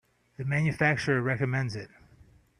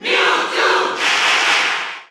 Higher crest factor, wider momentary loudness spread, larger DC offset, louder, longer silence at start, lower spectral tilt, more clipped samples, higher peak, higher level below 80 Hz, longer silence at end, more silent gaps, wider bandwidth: about the same, 18 dB vs 14 dB; first, 14 LU vs 4 LU; neither; second, -28 LUFS vs -14 LUFS; first, 0.4 s vs 0 s; first, -6.5 dB/octave vs 0 dB/octave; neither; second, -12 dBFS vs -2 dBFS; first, -60 dBFS vs -70 dBFS; first, 0.75 s vs 0.05 s; neither; second, 10.5 kHz vs over 20 kHz